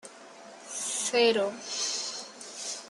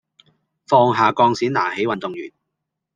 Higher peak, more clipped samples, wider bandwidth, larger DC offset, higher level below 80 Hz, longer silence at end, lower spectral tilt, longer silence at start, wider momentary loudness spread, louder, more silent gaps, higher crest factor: second, -12 dBFS vs -2 dBFS; neither; first, 12.5 kHz vs 9.4 kHz; neither; second, -84 dBFS vs -66 dBFS; second, 0 s vs 0.65 s; second, -0.5 dB/octave vs -6 dB/octave; second, 0.05 s vs 0.7 s; first, 23 LU vs 15 LU; second, -29 LUFS vs -18 LUFS; neither; about the same, 20 dB vs 18 dB